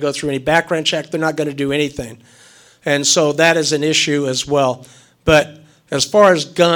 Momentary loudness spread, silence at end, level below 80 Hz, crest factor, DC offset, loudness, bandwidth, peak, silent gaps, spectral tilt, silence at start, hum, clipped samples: 11 LU; 0 s; -44 dBFS; 16 dB; under 0.1%; -15 LUFS; 19 kHz; 0 dBFS; none; -3.5 dB/octave; 0 s; none; under 0.1%